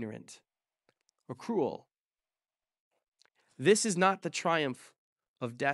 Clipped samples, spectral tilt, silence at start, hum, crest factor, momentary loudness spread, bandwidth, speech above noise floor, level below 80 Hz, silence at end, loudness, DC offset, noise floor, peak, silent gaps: under 0.1%; -4 dB/octave; 0 s; none; 22 dB; 21 LU; 12 kHz; over 59 dB; -84 dBFS; 0 s; -30 LUFS; under 0.1%; under -90 dBFS; -12 dBFS; 2.00-2.09 s, 2.80-2.91 s, 3.08-3.12 s, 4.98-5.16 s, 5.28-5.34 s